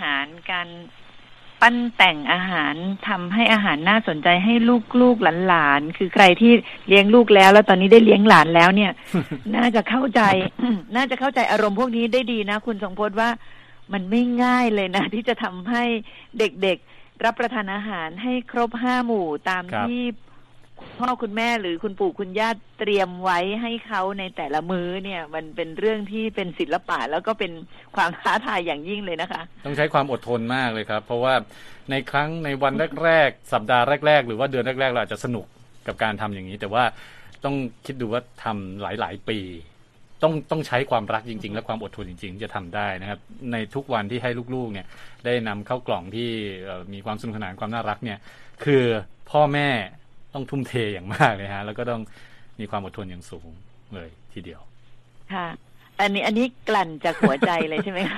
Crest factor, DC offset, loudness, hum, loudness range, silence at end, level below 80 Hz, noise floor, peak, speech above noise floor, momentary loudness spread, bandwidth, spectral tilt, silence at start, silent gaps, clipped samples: 22 dB; under 0.1%; -21 LUFS; none; 14 LU; 0 s; -54 dBFS; -47 dBFS; 0 dBFS; 26 dB; 16 LU; 14 kHz; -5.5 dB/octave; 0 s; none; under 0.1%